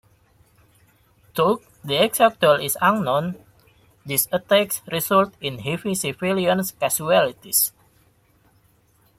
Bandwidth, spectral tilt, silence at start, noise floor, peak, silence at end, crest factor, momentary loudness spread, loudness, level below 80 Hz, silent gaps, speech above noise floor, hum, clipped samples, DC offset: 16.5 kHz; -3.5 dB/octave; 1.35 s; -60 dBFS; -2 dBFS; 1.5 s; 20 dB; 9 LU; -21 LUFS; -60 dBFS; none; 39 dB; none; under 0.1%; under 0.1%